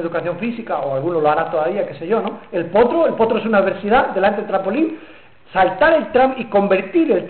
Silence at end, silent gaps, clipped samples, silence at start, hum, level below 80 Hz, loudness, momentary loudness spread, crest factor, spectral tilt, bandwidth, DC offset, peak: 0 s; none; under 0.1%; 0 s; none; -48 dBFS; -17 LUFS; 9 LU; 12 dB; -10.5 dB/octave; 4.5 kHz; 0.5%; -6 dBFS